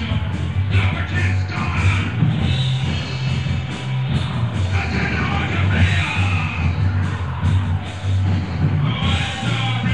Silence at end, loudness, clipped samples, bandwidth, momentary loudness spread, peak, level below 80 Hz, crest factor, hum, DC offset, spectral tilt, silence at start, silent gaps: 0 s; -20 LUFS; under 0.1%; 9.4 kHz; 4 LU; -4 dBFS; -32 dBFS; 14 dB; none; 1%; -6 dB/octave; 0 s; none